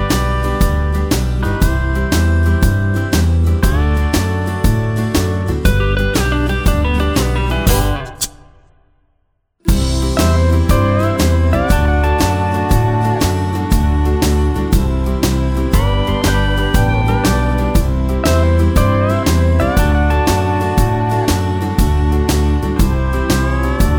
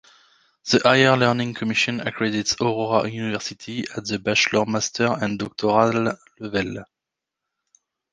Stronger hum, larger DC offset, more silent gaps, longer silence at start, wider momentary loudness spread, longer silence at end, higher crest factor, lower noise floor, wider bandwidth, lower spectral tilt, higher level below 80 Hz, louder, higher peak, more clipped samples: neither; neither; neither; second, 0 s vs 0.65 s; second, 3 LU vs 12 LU; second, 0 s vs 1.3 s; second, 14 dB vs 22 dB; second, -63 dBFS vs -85 dBFS; first, over 20 kHz vs 10 kHz; first, -6 dB/octave vs -4 dB/octave; first, -18 dBFS vs -58 dBFS; first, -15 LUFS vs -21 LUFS; about the same, 0 dBFS vs -2 dBFS; neither